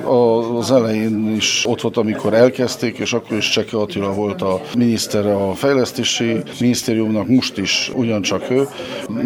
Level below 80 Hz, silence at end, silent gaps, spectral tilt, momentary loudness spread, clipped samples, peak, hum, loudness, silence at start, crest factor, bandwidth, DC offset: -56 dBFS; 0 s; none; -4.5 dB/octave; 6 LU; under 0.1%; 0 dBFS; none; -17 LUFS; 0 s; 18 dB; 18 kHz; under 0.1%